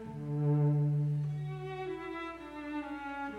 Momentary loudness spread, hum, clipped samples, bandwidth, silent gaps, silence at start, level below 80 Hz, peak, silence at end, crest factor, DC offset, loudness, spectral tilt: 12 LU; 60 Hz at -60 dBFS; under 0.1%; 4.6 kHz; none; 0 s; -62 dBFS; -22 dBFS; 0 s; 12 dB; under 0.1%; -35 LUFS; -9.5 dB/octave